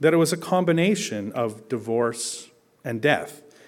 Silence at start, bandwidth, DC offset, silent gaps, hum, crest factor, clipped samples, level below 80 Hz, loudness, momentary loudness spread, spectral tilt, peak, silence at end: 0 s; 16.5 kHz; under 0.1%; none; none; 20 dB; under 0.1%; -68 dBFS; -24 LUFS; 12 LU; -5 dB/octave; -4 dBFS; 0.25 s